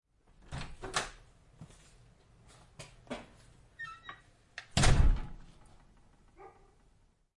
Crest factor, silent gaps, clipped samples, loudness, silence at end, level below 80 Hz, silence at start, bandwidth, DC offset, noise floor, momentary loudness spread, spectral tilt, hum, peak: 24 dB; none; under 0.1%; -35 LUFS; 0.9 s; -38 dBFS; 0.5 s; 11.5 kHz; under 0.1%; -67 dBFS; 28 LU; -4 dB/octave; none; -10 dBFS